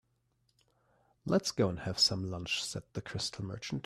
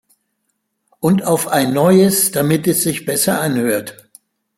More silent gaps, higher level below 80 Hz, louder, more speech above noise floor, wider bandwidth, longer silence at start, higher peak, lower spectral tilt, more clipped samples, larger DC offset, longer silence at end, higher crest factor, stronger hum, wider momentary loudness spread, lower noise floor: neither; second, -64 dBFS vs -56 dBFS; second, -33 LUFS vs -15 LUFS; second, 42 dB vs 56 dB; second, 14.5 kHz vs 16.5 kHz; first, 1.25 s vs 1 s; second, -16 dBFS vs -2 dBFS; about the same, -4 dB/octave vs -4.5 dB/octave; neither; neither; second, 0.05 s vs 0.65 s; about the same, 20 dB vs 16 dB; neither; first, 13 LU vs 8 LU; first, -76 dBFS vs -70 dBFS